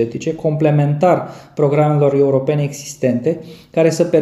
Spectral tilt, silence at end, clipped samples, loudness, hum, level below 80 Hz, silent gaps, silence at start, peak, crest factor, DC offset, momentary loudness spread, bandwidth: -7.5 dB/octave; 0 s; under 0.1%; -16 LUFS; none; -56 dBFS; none; 0 s; -2 dBFS; 14 dB; under 0.1%; 8 LU; 12.5 kHz